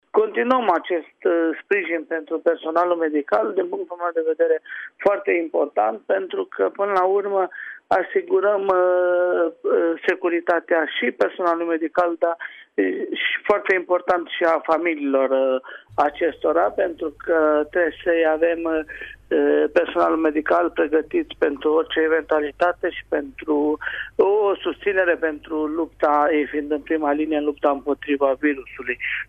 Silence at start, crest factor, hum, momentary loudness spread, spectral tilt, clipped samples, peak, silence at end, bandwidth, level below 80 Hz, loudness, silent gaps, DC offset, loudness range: 0.15 s; 14 dB; none; 7 LU; -6 dB/octave; under 0.1%; -6 dBFS; 0.05 s; 6.4 kHz; -56 dBFS; -21 LUFS; none; under 0.1%; 2 LU